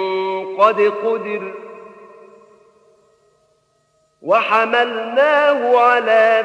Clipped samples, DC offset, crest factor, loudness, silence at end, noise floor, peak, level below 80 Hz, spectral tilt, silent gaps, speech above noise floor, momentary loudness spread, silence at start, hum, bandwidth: under 0.1%; under 0.1%; 16 dB; -15 LUFS; 0 s; -62 dBFS; 0 dBFS; -78 dBFS; -4.5 dB/octave; none; 47 dB; 14 LU; 0 s; none; 9.8 kHz